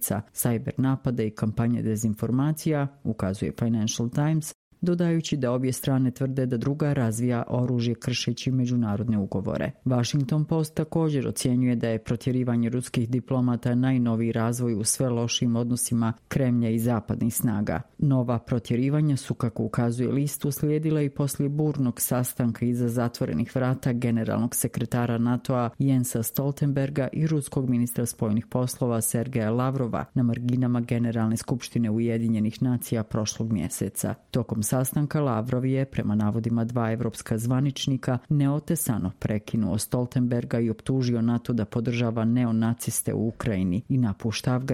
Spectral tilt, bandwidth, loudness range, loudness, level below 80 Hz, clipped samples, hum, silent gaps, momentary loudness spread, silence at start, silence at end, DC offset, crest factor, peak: -6 dB/octave; 16.5 kHz; 1 LU; -26 LUFS; -54 dBFS; under 0.1%; none; 4.55-4.71 s; 4 LU; 0 s; 0 s; under 0.1%; 16 dB; -10 dBFS